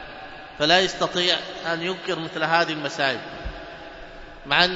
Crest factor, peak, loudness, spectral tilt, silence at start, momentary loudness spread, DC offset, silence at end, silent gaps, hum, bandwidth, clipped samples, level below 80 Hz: 24 dB; -2 dBFS; -22 LUFS; -3 dB/octave; 0 s; 21 LU; under 0.1%; 0 s; none; none; 8 kHz; under 0.1%; -48 dBFS